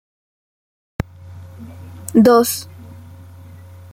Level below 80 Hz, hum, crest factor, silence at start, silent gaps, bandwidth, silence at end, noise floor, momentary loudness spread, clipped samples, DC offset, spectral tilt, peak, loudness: -48 dBFS; none; 18 dB; 1.3 s; none; 16.5 kHz; 1 s; -39 dBFS; 27 LU; under 0.1%; under 0.1%; -5.5 dB/octave; -2 dBFS; -16 LUFS